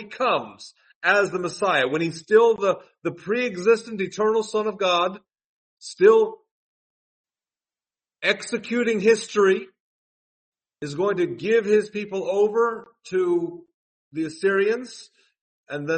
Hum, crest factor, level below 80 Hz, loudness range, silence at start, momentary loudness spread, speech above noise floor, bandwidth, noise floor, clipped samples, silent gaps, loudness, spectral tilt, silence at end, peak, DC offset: none; 20 dB; -72 dBFS; 3 LU; 0 s; 13 LU; over 68 dB; 8.8 kHz; under -90 dBFS; under 0.1%; 0.95-1.01 s, 5.44-5.77 s, 6.51-7.24 s, 9.80-10.52 s, 13.74-14.11 s, 15.41-15.64 s; -22 LUFS; -4.5 dB/octave; 0 s; -4 dBFS; under 0.1%